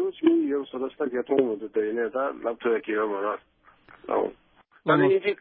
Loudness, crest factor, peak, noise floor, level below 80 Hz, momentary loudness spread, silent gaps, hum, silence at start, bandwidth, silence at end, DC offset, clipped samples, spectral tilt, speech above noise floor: -26 LUFS; 18 dB; -8 dBFS; -53 dBFS; -70 dBFS; 10 LU; none; none; 0 s; 4.6 kHz; 0.05 s; under 0.1%; under 0.1%; -10.5 dB/octave; 28 dB